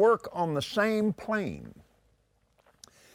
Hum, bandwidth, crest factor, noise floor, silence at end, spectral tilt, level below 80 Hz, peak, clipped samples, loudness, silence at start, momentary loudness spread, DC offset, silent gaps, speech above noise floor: none; 15.5 kHz; 18 dB; -69 dBFS; 1.45 s; -6 dB/octave; -64 dBFS; -12 dBFS; under 0.1%; -29 LUFS; 0 s; 14 LU; under 0.1%; none; 41 dB